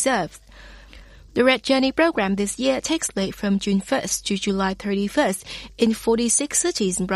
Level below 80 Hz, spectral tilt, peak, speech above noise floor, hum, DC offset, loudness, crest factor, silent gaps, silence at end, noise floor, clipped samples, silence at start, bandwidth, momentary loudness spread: -48 dBFS; -3.5 dB/octave; -4 dBFS; 23 dB; none; under 0.1%; -21 LUFS; 18 dB; none; 0 s; -45 dBFS; under 0.1%; 0 s; 14 kHz; 6 LU